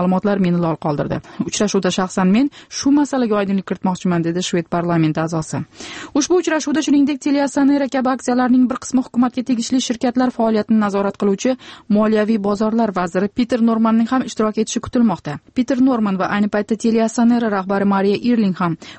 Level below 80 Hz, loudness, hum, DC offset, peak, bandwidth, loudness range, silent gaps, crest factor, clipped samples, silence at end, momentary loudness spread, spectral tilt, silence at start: -52 dBFS; -18 LUFS; none; under 0.1%; -6 dBFS; 8.8 kHz; 2 LU; none; 12 dB; under 0.1%; 0 s; 6 LU; -5.5 dB/octave; 0 s